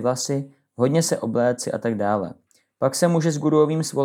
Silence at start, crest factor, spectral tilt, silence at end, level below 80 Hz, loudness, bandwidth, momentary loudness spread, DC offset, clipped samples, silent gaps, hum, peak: 0 s; 16 dB; -5.5 dB/octave; 0 s; -76 dBFS; -22 LUFS; 16.5 kHz; 7 LU; under 0.1%; under 0.1%; none; none; -4 dBFS